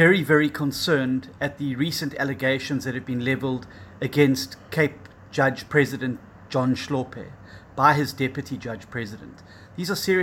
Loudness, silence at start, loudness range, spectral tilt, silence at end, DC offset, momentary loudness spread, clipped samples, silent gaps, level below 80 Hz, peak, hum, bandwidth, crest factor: -24 LUFS; 0 s; 2 LU; -5.5 dB/octave; 0 s; under 0.1%; 14 LU; under 0.1%; none; -58 dBFS; -4 dBFS; none; 17 kHz; 20 dB